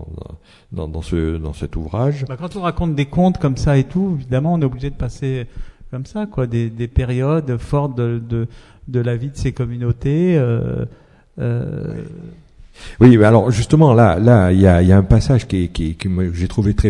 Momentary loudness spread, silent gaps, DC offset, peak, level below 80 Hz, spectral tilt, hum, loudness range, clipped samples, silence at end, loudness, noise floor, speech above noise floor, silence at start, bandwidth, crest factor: 16 LU; none; under 0.1%; 0 dBFS; -32 dBFS; -8 dB/octave; none; 9 LU; under 0.1%; 0 s; -17 LUFS; -38 dBFS; 23 dB; 0 s; 11 kHz; 16 dB